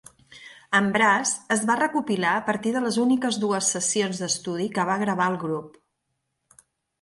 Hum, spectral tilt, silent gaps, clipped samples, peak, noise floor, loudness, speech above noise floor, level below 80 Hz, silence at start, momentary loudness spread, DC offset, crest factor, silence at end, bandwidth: none; -3.5 dB/octave; none; under 0.1%; -6 dBFS; -78 dBFS; -23 LUFS; 54 dB; -70 dBFS; 0.3 s; 7 LU; under 0.1%; 18 dB; 1.3 s; 11.5 kHz